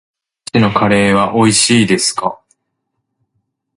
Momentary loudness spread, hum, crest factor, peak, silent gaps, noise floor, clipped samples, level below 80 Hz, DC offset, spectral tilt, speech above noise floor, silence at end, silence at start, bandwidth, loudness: 10 LU; none; 14 dB; 0 dBFS; none; -72 dBFS; under 0.1%; -46 dBFS; under 0.1%; -4 dB/octave; 60 dB; 1.45 s; 0.55 s; 11.5 kHz; -12 LUFS